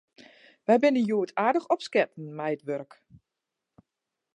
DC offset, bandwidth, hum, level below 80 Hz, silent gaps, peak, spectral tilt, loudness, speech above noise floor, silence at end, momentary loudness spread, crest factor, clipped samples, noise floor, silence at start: under 0.1%; 11 kHz; none; -78 dBFS; none; -8 dBFS; -6 dB/octave; -27 LUFS; 60 dB; 1.5 s; 13 LU; 20 dB; under 0.1%; -86 dBFS; 0.7 s